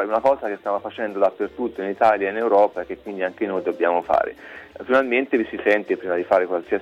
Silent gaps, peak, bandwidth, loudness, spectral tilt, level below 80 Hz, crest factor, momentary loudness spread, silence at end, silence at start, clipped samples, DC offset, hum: none; -6 dBFS; 8 kHz; -22 LUFS; -6.5 dB/octave; -60 dBFS; 16 dB; 9 LU; 0 s; 0 s; under 0.1%; under 0.1%; none